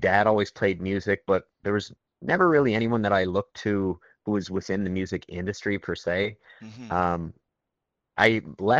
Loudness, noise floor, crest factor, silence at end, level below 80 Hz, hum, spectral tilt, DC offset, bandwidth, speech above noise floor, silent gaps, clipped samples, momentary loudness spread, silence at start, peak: -26 LUFS; -84 dBFS; 20 dB; 0 s; -56 dBFS; none; -6.5 dB/octave; under 0.1%; 8.2 kHz; 59 dB; none; under 0.1%; 11 LU; 0 s; -6 dBFS